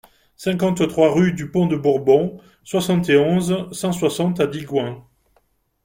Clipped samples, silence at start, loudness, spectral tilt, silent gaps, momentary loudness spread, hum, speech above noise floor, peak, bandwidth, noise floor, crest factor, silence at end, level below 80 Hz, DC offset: under 0.1%; 0.4 s; -19 LUFS; -6 dB/octave; none; 9 LU; none; 45 dB; -2 dBFS; 16.5 kHz; -63 dBFS; 18 dB; 0.85 s; -54 dBFS; under 0.1%